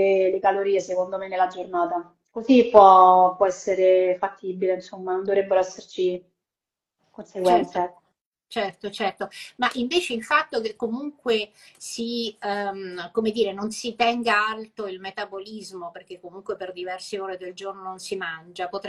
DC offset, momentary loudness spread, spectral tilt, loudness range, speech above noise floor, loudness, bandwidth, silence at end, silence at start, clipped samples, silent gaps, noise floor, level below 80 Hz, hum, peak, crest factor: under 0.1%; 16 LU; -4 dB/octave; 11 LU; 66 dB; -23 LUFS; 12.5 kHz; 0 s; 0 s; under 0.1%; 8.21-8.32 s; -89 dBFS; -66 dBFS; none; 0 dBFS; 24 dB